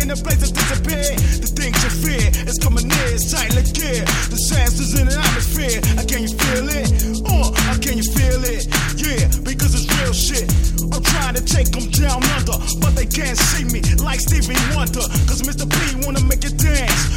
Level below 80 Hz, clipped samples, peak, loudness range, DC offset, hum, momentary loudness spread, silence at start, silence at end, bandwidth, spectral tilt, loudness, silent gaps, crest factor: -20 dBFS; under 0.1%; -2 dBFS; 1 LU; under 0.1%; none; 3 LU; 0 s; 0 s; 17 kHz; -3.5 dB/octave; -17 LUFS; none; 14 dB